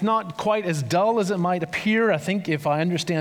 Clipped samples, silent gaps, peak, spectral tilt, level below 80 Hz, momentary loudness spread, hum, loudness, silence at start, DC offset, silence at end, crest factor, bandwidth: under 0.1%; none; -8 dBFS; -5.5 dB/octave; -66 dBFS; 3 LU; none; -23 LUFS; 0 s; under 0.1%; 0 s; 14 dB; 16.5 kHz